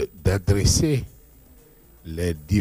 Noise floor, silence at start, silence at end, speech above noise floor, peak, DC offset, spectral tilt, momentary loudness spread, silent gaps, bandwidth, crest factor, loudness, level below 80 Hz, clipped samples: -51 dBFS; 0 s; 0 s; 30 dB; -8 dBFS; under 0.1%; -5 dB/octave; 13 LU; none; 15.5 kHz; 16 dB; -22 LUFS; -36 dBFS; under 0.1%